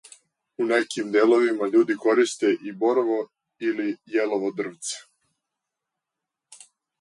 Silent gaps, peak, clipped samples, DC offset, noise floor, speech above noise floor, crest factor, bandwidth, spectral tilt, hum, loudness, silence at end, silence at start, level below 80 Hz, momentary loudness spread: none; -8 dBFS; under 0.1%; under 0.1%; -86 dBFS; 63 dB; 16 dB; 11.5 kHz; -4 dB/octave; none; -23 LUFS; 0.45 s; 0.6 s; -80 dBFS; 11 LU